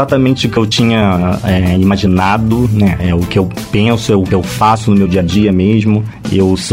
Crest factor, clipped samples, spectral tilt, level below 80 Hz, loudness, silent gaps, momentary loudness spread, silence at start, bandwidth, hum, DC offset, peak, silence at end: 10 dB; under 0.1%; -6.5 dB/octave; -32 dBFS; -11 LUFS; none; 4 LU; 0 s; 16.5 kHz; none; under 0.1%; 0 dBFS; 0 s